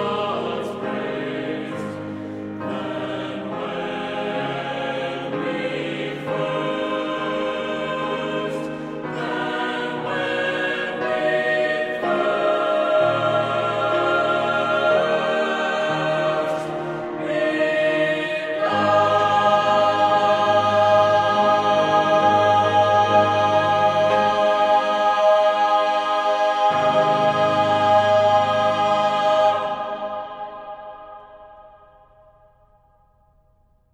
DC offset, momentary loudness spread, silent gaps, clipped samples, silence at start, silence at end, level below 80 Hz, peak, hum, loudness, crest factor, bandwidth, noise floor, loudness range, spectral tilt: under 0.1%; 11 LU; none; under 0.1%; 0 s; 2.25 s; -62 dBFS; -4 dBFS; none; -20 LUFS; 16 dB; 10 kHz; -59 dBFS; 10 LU; -5 dB/octave